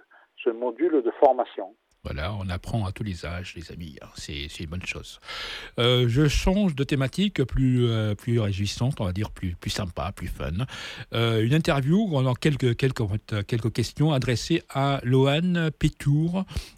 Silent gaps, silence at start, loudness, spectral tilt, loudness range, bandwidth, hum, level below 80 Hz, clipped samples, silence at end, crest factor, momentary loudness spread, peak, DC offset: none; 0.4 s; -25 LUFS; -6.5 dB/octave; 9 LU; 15 kHz; none; -40 dBFS; under 0.1%; 0.05 s; 20 dB; 13 LU; -6 dBFS; under 0.1%